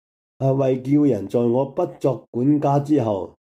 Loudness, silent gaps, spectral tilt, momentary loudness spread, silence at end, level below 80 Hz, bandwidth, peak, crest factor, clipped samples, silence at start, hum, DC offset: -21 LUFS; 2.28-2.33 s; -9.5 dB/octave; 6 LU; 0.3 s; -64 dBFS; 8.2 kHz; -8 dBFS; 12 dB; under 0.1%; 0.4 s; none; under 0.1%